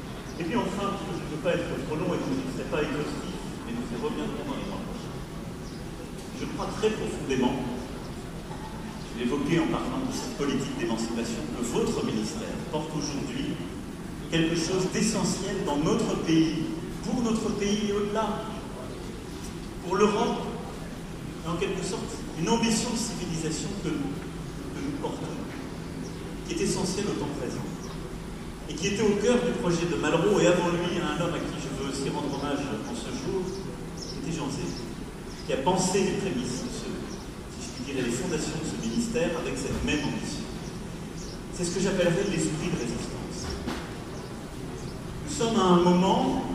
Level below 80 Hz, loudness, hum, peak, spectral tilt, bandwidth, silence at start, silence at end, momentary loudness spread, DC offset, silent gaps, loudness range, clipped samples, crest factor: -44 dBFS; -29 LUFS; none; -8 dBFS; -5 dB/octave; 15.5 kHz; 0 s; 0 s; 13 LU; under 0.1%; none; 6 LU; under 0.1%; 22 dB